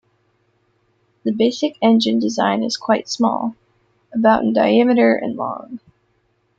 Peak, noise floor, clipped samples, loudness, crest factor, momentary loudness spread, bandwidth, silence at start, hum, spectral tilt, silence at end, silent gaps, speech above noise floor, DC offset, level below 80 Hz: -2 dBFS; -64 dBFS; under 0.1%; -17 LUFS; 16 dB; 13 LU; 7.8 kHz; 1.25 s; none; -5 dB/octave; 0.8 s; none; 47 dB; under 0.1%; -60 dBFS